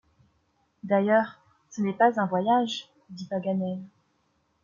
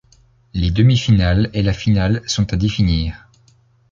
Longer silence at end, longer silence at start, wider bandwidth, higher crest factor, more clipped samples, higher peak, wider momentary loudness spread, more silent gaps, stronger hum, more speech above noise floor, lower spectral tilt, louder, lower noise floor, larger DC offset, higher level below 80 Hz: about the same, 0.8 s vs 0.75 s; first, 0.85 s vs 0.55 s; about the same, 7.4 kHz vs 7.6 kHz; first, 20 dB vs 14 dB; neither; second, -8 dBFS vs -2 dBFS; first, 19 LU vs 7 LU; neither; neither; first, 46 dB vs 38 dB; about the same, -6 dB/octave vs -6 dB/octave; second, -26 LUFS vs -17 LUFS; first, -71 dBFS vs -54 dBFS; neither; second, -74 dBFS vs -28 dBFS